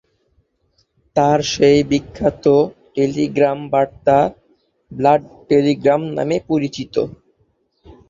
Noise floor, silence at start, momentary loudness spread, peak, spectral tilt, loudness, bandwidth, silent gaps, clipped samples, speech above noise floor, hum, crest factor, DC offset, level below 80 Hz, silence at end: -63 dBFS; 1.15 s; 8 LU; -2 dBFS; -6 dB/octave; -17 LUFS; 7.6 kHz; none; under 0.1%; 47 dB; none; 16 dB; under 0.1%; -48 dBFS; 1 s